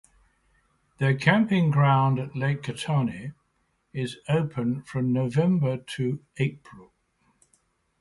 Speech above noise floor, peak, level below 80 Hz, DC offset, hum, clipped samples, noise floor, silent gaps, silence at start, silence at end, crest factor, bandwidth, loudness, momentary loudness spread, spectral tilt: 47 dB; -8 dBFS; -60 dBFS; under 0.1%; none; under 0.1%; -72 dBFS; none; 1 s; 1.2 s; 18 dB; 11.5 kHz; -25 LUFS; 11 LU; -7.5 dB/octave